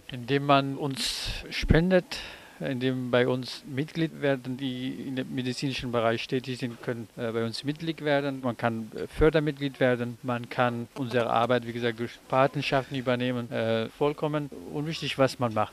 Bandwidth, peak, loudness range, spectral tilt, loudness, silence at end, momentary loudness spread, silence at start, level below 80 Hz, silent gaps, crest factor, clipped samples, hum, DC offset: 15 kHz; -6 dBFS; 3 LU; -6 dB/octave; -28 LUFS; 0 s; 10 LU; 0.1 s; -44 dBFS; none; 22 dB; under 0.1%; none; under 0.1%